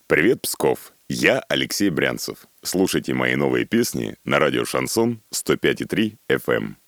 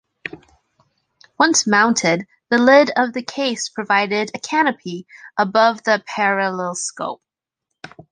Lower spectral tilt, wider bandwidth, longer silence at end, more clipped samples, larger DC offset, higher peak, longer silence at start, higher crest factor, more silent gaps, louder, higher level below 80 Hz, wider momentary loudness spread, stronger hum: about the same, -4 dB/octave vs -3 dB/octave; first, over 20 kHz vs 10 kHz; about the same, 0.15 s vs 0.25 s; neither; neither; about the same, 0 dBFS vs 0 dBFS; second, 0.1 s vs 0.25 s; about the same, 22 dB vs 18 dB; neither; second, -21 LUFS vs -17 LUFS; first, -52 dBFS vs -66 dBFS; second, 7 LU vs 17 LU; neither